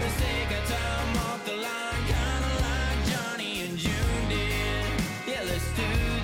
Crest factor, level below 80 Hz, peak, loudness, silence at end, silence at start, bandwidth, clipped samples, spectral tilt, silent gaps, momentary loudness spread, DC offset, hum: 12 dB; -32 dBFS; -16 dBFS; -29 LUFS; 0 s; 0 s; 17 kHz; under 0.1%; -4.5 dB/octave; none; 3 LU; under 0.1%; none